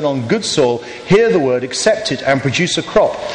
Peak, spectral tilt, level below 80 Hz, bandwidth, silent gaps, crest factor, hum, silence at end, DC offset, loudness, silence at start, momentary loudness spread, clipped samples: -2 dBFS; -4.5 dB/octave; -44 dBFS; 11 kHz; none; 12 dB; none; 0 s; under 0.1%; -15 LUFS; 0 s; 5 LU; under 0.1%